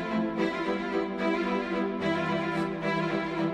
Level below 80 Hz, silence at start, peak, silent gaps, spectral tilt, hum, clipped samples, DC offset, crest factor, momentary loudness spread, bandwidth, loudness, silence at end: -58 dBFS; 0 s; -16 dBFS; none; -6.5 dB/octave; none; under 0.1%; under 0.1%; 14 dB; 2 LU; 9.8 kHz; -29 LUFS; 0 s